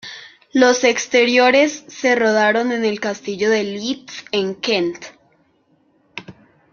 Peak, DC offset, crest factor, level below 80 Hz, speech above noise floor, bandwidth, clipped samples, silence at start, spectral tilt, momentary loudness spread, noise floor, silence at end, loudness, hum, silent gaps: -2 dBFS; under 0.1%; 18 dB; -64 dBFS; 43 dB; 7.2 kHz; under 0.1%; 0.05 s; -3 dB/octave; 22 LU; -60 dBFS; 0.4 s; -17 LUFS; none; none